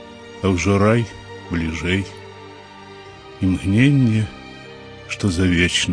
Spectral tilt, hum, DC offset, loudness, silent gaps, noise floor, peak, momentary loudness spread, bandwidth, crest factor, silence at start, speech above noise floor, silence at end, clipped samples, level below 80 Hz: -5.5 dB/octave; none; under 0.1%; -19 LUFS; none; -39 dBFS; -2 dBFS; 23 LU; 10.5 kHz; 18 dB; 0 s; 22 dB; 0 s; under 0.1%; -40 dBFS